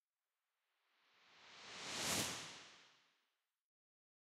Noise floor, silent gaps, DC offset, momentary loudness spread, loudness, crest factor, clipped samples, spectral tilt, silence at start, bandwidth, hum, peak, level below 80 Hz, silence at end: under -90 dBFS; none; under 0.1%; 23 LU; -43 LUFS; 24 dB; under 0.1%; -1.5 dB/octave; 1.25 s; 15.5 kHz; none; -26 dBFS; -80 dBFS; 1.35 s